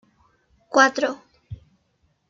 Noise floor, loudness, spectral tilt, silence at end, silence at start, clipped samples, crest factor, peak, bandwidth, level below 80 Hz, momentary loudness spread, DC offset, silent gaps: -67 dBFS; -20 LUFS; -3 dB/octave; 0.75 s; 0.7 s; under 0.1%; 22 dB; -2 dBFS; 7.8 kHz; -58 dBFS; 25 LU; under 0.1%; none